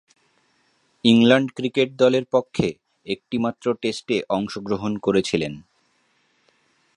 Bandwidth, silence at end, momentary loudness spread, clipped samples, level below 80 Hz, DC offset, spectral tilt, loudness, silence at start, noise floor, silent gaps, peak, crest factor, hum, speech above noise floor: 10.5 kHz; 1.35 s; 12 LU; under 0.1%; -56 dBFS; under 0.1%; -5.5 dB/octave; -21 LUFS; 1.05 s; -65 dBFS; none; 0 dBFS; 22 dB; none; 44 dB